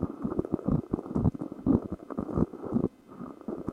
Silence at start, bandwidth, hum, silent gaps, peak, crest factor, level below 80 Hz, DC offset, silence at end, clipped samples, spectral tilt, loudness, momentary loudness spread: 0 s; 9 kHz; none; none; -10 dBFS; 22 dB; -46 dBFS; under 0.1%; 0 s; under 0.1%; -11 dB/octave; -31 LUFS; 11 LU